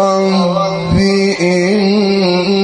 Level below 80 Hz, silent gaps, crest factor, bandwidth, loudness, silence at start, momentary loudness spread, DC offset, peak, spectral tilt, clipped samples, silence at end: -34 dBFS; none; 10 dB; 10 kHz; -12 LUFS; 0 s; 2 LU; under 0.1%; -2 dBFS; -6 dB/octave; under 0.1%; 0 s